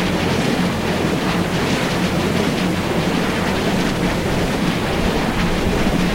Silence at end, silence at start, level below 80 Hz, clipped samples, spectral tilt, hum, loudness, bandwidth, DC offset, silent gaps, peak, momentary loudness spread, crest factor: 0 s; 0 s; -30 dBFS; under 0.1%; -5.5 dB/octave; none; -19 LUFS; 16 kHz; under 0.1%; none; -4 dBFS; 1 LU; 14 dB